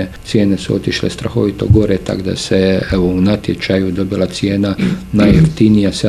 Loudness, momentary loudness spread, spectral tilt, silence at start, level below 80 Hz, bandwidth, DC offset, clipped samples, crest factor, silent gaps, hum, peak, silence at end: -14 LUFS; 7 LU; -6.5 dB/octave; 0 s; -30 dBFS; 13 kHz; under 0.1%; under 0.1%; 12 dB; none; none; 0 dBFS; 0 s